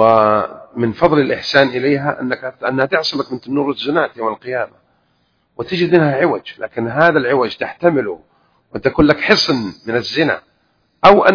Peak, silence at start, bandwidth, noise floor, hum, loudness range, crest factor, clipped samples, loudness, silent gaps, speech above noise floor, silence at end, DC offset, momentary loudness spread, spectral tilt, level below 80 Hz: 0 dBFS; 0 s; 5.4 kHz; -62 dBFS; none; 4 LU; 16 dB; 0.4%; -16 LUFS; none; 47 dB; 0 s; under 0.1%; 11 LU; -6 dB/octave; -46 dBFS